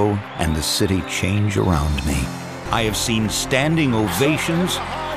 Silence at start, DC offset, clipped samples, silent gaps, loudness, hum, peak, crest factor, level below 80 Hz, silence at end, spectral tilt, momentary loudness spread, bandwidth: 0 s; under 0.1%; under 0.1%; none; -20 LUFS; none; -4 dBFS; 16 dB; -32 dBFS; 0 s; -4.5 dB/octave; 5 LU; 15.5 kHz